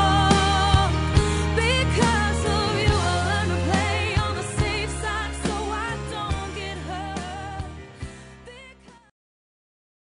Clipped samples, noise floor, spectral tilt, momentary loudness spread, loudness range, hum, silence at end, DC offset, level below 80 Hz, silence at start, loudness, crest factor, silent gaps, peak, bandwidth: under 0.1%; -48 dBFS; -5 dB/octave; 18 LU; 14 LU; none; 1.25 s; under 0.1%; -34 dBFS; 0 s; -23 LUFS; 16 dB; none; -8 dBFS; 11 kHz